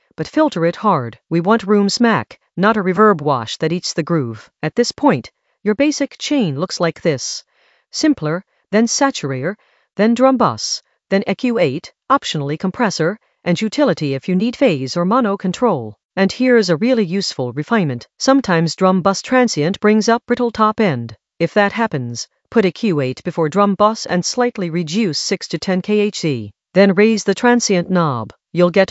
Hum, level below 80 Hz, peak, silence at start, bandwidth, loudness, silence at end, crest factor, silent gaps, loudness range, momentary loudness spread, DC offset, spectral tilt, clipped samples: none; -58 dBFS; 0 dBFS; 0.2 s; 8.2 kHz; -17 LUFS; 0.05 s; 16 dB; 16.05-16.09 s; 3 LU; 9 LU; under 0.1%; -5 dB/octave; under 0.1%